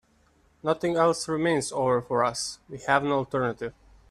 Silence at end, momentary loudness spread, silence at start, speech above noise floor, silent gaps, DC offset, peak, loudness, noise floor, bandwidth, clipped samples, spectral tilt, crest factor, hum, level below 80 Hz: 0.4 s; 10 LU; 0.65 s; 37 dB; none; under 0.1%; -6 dBFS; -26 LUFS; -63 dBFS; 13.5 kHz; under 0.1%; -4.5 dB/octave; 20 dB; none; -60 dBFS